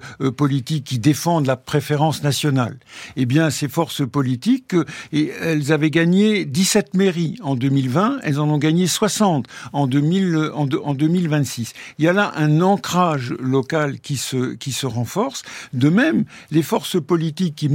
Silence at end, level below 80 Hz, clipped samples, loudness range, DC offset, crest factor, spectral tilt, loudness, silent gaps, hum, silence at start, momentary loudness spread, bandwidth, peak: 0 s; -60 dBFS; under 0.1%; 3 LU; under 0.1%; 16 dB; -5.5 dB/octave; -19 LUFS; none; none; 0 s; 7 LU; 17 kHz; -4 dBFS